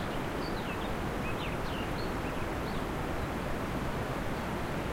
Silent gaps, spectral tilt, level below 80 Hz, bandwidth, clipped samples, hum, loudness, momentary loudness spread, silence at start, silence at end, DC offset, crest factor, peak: none; -6 dB/octave; -42 dBFS; 16 kHz; under 0.1%; none; -35 LUFS; 0 LU; 0 s; 0 s; under 0.1%; 14 dB; -20 dBFS